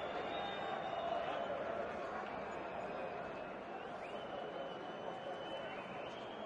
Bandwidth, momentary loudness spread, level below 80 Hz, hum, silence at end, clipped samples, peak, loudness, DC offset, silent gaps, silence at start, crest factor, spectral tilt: 10.5 kHz; 6 LU; -72 dBFS; none; 0 s; under 0.1%; -30 dBFS; -44 LUFS; under 0.1%; none; 0 s; 14 dB; -5 dB/octave